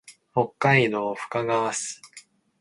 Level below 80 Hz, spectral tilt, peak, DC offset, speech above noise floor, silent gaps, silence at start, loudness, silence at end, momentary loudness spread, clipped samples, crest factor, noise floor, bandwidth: -66 dBFS; -4.5 dB/octave; -4 dBFS; under 0.1%; 28 dB; none; 0.1 s; -24 LUFS; 0.4 s; 11 LU; under 0.1%; 22 dB; -52 dBFS; 11.5 kHz